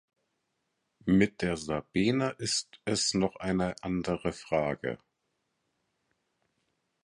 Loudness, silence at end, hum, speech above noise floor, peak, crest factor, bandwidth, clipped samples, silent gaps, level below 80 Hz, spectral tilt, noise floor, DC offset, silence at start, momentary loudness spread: -30 LUFS; 2.1 s; none; 50 dB; -10 dBFS; 22 dB; 11.5 kHz; under 0.1%; none; -56 dBFS; -4.5 dB/octave; -80 dBFS; under 0.1%; 1.05 s; 8 LU